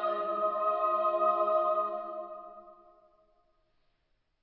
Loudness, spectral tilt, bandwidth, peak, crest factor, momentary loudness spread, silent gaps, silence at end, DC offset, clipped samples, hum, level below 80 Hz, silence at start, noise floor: -29 LUFS; -7.5 dB/octave; 4.7 kHz; -16 dBFS; 16 dB; 16 LU; none; 1.7 s; under 0.1%; under 0.1%; none; -78 dBFS; 0 s; -75 dBFS